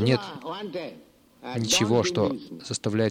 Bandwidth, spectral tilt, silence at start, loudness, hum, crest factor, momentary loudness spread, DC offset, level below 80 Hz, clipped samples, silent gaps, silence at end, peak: 16.5 kHz; -4.5 dB/octave; 0 s; -26 LUFS; none; 18 dB; 15 LU; under 0.1%; -62 dBFS; under 0.1%; none; 0 s; -8 dBFS